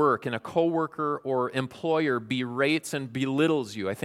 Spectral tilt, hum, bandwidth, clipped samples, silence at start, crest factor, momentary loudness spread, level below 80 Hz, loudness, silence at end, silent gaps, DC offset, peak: -5.5 dB/octave; none; 15.5 kHz; under 0.1%; 0 s; 16 dB; 5 LU; -70 dBFS; -27 LUFS; 0 s; none; under 0.1%; -10 dBFS